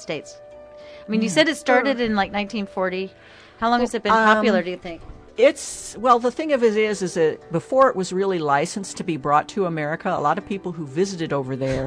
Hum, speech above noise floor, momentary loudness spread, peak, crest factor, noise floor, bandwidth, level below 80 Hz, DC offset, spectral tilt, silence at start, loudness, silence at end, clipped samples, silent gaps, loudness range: none; 20 dB; 12 LU; -4 dBFS; 18 dB; -42 dBFS; 11 kHz; -50 dBFS; under 0.1%; -4.5 dB/octave; 0 s; -21 LUFS; 0 s; under 0.1%; none; 3 LU